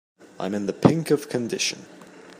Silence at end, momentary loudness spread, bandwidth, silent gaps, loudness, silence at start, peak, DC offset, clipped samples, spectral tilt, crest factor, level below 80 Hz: 0.05 s; 11 LU; 15.5 kHz; none; -24 LUFS; 0.4 s; 0 dBFS; under 0.1%; under 0.1%; -5 dB/octave; 24 dB; -64 dBFS